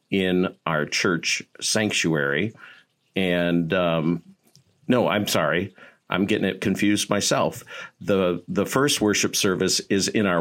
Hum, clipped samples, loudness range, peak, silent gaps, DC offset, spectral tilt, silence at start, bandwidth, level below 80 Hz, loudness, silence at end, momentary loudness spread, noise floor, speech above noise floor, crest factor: none; under 0.1%; 2 LU; -4 dBFS; none; under 0.1%; -4 dB/octave; 0.1 s; 16.5 kHz; -62 dBFS; -22 LUFS; 0 s; 7 LU; -59 dBFS; 37 dB; 20 dB